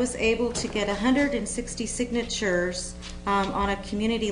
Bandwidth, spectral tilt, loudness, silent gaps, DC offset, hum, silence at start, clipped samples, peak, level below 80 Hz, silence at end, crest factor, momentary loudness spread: 10 kHz; -4 dB/octave; -26 LUFS; none; under 0.1%; none; 0 s; under 0.1%; -10 dBFS; -42 dBFS; 0 s; 16 dB; 7 LU